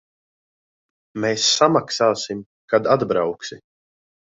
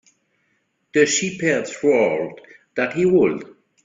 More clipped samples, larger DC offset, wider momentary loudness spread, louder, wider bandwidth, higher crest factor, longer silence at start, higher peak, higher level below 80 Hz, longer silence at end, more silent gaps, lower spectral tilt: neither; neither; first, 17 LU vs 11 LU; about the same, -19 LUFS vs -19 LUFS; about the same, 8 kHz vs 7.8 kHz; about the same, 20 dB vs 20 dB; first, 1.15 s vs 0.95 s; about the same, -2 dBFS vs -2 dBFS; about the same, -62 dBFS vs -62 dBFS; first, 0.8 s vs 0.35 s; first, 2.46-2.68 s vs none; about the same, -3 dB/octave vs -4 dB/octave